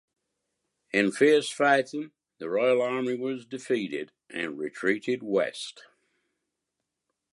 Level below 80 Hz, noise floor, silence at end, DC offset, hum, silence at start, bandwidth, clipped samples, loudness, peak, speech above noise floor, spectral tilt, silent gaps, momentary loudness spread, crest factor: -80 dBFS; -84 dBFS; 1.55 s; under 0.1%; none; 0.95 s; 11.5 kHz; under 0.1%; -27 LUFS; -8 dBFS; 58 dB; -4.5 dB/octave; none; 15 LU; 20 dB